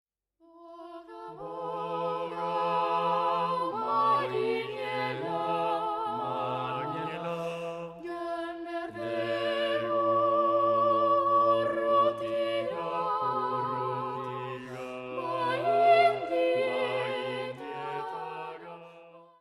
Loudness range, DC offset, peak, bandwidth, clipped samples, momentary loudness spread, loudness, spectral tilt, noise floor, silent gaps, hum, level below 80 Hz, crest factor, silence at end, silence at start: 7 LU; under 0.1%; -12 dBFS; 12.5 kHz; under 0.1%; 14 LU; -29 LUFS; -6 dB/octave; -63 dBFS; none; none; -70 dBFS; 18 dB; 0.15 s; 0.55 s